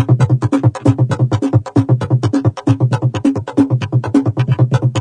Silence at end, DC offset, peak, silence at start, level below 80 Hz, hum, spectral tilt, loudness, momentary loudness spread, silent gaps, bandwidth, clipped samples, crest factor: 0 s; under 0.1%; 0 dBFS; 0 s; -46 dBFS; none; -8.5 dB/octave; -15 LUFS; 2 LU; none; 9.6 kHz; under 0.1%; 14 dB